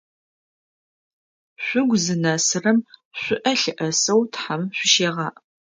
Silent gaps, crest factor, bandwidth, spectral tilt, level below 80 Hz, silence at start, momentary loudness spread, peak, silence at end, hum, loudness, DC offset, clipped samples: 3.05-3.11 s; 20 dB; 9.6 kHz; -3 dB/octave; -68 dBFS; 1.6 s; 11 LU; -4 dBFS; 0.45 s; none; -20 LUFS; under 0.1%; under 0.1%